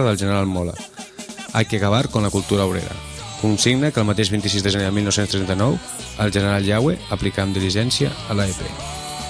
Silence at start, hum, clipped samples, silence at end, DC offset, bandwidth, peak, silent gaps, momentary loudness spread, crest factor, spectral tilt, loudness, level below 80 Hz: 0 s; none; under 0.1%; 0 s; under 0.1%; 11 kHz; -4 dBFS; none; 11 LU; 16 dB; -5 dB/octave; -20 LUFS; -42 dBFS